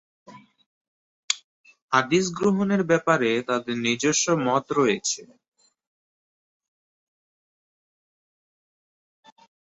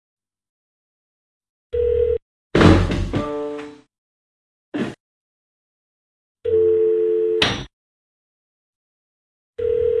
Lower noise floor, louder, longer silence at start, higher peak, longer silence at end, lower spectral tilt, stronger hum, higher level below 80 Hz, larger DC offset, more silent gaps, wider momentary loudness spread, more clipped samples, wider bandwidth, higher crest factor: about the same, under -90 dBFS vs under -90 dBFS; second, -23 LUFS vs -20 LUFS; second, 0.3 s vs 1.75 s; second, -4 dBFS vs 0 dBFS; first, 4.4 s vs 0 s; second, -4 dB/octave vs -6.5 dB/octave; neither; second, -66 dBFS vs -38 dBFS; neither; second, 0.66-1.28 s, 1.44-1.64 s, 1.82-1.88 s vs 2.22-2.50 s, 3.98-4.72 s, 5.00-6.35 s, 7.73-9.53 s; second, 7 LU vs 16 LU; neither; second, 8.4 kHz vs 11.5 kHz; about the same, 22 dB vs 22 dB